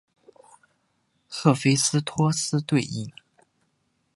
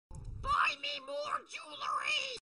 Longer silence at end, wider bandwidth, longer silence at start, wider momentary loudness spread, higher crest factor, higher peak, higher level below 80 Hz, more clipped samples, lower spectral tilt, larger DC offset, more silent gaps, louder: first, 1.05 s vs 0.15 s; about the same, 11.5 kHz vs 10.5 kHz; first, 1.3 s vs 0.1 s; about the same, 14 LU vs 12 LU; first, 24 dB vs 18 dB; first, -2 dBFS vs -20 dBFS; second, -66 dBFS vs -52 dBFS; neither; first, -4.5 dB/octave vs -2 dB/octave; neither; neither; first, -23 LUFS vs -35 LUFS